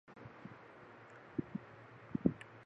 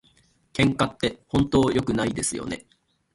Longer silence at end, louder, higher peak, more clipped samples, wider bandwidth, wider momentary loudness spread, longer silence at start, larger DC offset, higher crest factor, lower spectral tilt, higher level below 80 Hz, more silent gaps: second, 0 s vs 0.55 s; second, -42 LUFS vs -24 LUFS; second, -16 dBFS vs -6 dBFS; neither; second, 8.8 kHz vs 11.5 kHz; first, 19 LU vs 13 LU; second, 0.05 s vs 0.55 s; neither; first, 28 dB vs 18 dB; first, -9 dB/octave vs -5 dB/octave; second, -66 dBFS vs -46 dBFS; neither